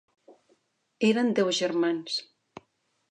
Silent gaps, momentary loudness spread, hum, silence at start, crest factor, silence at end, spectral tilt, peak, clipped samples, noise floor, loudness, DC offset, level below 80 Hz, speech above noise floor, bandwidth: none; 8 LU; none; 0.3 s; 18 dB; 0.9 s; -4 dB/octave; -12 dBFS; under 0.1%; -72 dBFS; -26 LUFS; under 0.1%; -82 dBFS; 47 dB; 10 kHz